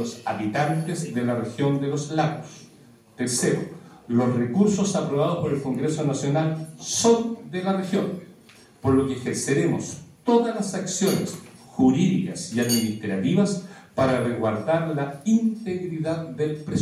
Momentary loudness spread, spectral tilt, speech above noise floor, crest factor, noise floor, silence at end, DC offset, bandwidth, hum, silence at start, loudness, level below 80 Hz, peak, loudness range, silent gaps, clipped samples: 9 LU; -5.5 dB/octave; 28 dB; 18 dB; -52 dBFS; 0 s; under 0.1%; 15.5 kHz; none; 0 s; -24 LUFS; -60 dBFS; -6 dBFS; 3 LU; none; under 0.1%